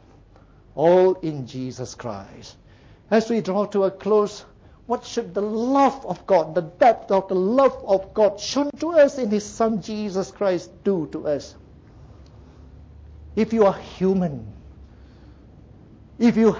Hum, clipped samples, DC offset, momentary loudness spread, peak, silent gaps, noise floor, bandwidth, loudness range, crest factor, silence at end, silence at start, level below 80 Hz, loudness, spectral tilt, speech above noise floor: none; under 0.1%; under 0.1%; 14 LU; -6 dBFS; none; -50 dBFS; 7.8 kHz; 6 LU; 16 dB; 0 s; 0.75 s; -50 dBFS; -22 LUFS; -6 dB/octave; 30 dB